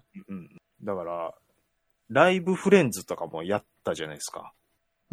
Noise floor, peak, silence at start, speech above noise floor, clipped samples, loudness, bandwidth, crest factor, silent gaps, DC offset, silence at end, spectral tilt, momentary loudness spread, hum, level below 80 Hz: -74 dBFS; -4 dBFS; 0.15 s; 48 dB; under 0.1%; -26 LUFS; 14.5 kHz; 24 dB; none; under 0.1%; 0.65 s; -5 dB/octave; 21 LU; none; -68 dBFS